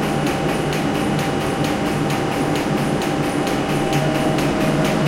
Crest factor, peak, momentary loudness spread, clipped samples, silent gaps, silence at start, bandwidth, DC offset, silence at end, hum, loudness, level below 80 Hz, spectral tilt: 14 dB; -6 dBFS; 2 LU; under 0.1%; none; 0 s; 17 kHz; under 0.1%; 0 s; none; -20 LUFS; -40 dBFS; -5.5 dB/octave